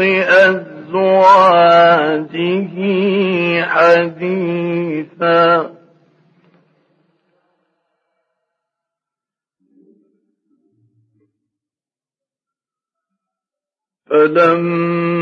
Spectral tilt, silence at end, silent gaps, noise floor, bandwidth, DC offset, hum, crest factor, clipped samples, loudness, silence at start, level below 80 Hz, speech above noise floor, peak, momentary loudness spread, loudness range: -7 dB/octave; 0 s; none; under -90 dBFS; 8.2 kHz; under 0.1%; none; 16 dB; under 0.1%; -13 LUFS; 0 s; -70 dBFS; over 78 dB; 0 dBFS; 11 LU; 8 LU